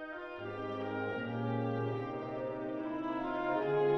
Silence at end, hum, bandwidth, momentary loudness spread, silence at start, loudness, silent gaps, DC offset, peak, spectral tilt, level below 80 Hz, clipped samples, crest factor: 0 s; none; 6.2 kHz; 7 LU; 0 s; -37 LUFS; none; under 0.1%; -20 dBFS; -9 dB/octave; -64 dBFS; under 0.1%; 16 dB